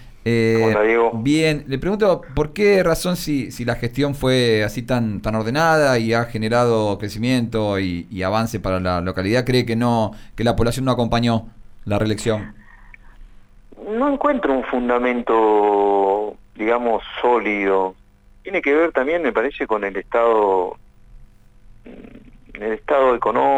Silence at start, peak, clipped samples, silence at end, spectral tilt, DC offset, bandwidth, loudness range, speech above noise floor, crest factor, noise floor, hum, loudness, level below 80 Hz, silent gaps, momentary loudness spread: 0 s; -6 dBFS; under 0.1%; 0 s; -6 dB/octave; under 0.1%; 19.5 kHz; 4 LU; 27 dB; 14 dB; -46 dBFS; none; -19 LUFS; -40 dBFS; none; 8 LU